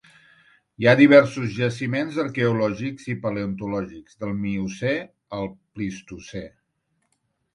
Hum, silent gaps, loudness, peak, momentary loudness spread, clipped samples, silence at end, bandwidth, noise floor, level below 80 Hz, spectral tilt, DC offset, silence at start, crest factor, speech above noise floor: none; none; -22 LUFS; 0 dBFS; 20 LU; under 0.1%; 1.05 s; 10.5 kHz; -73 dBFS; -56 dBFS; -7 dB/octave; under 0.1%; 0.8 s; 22 dB; 51 dB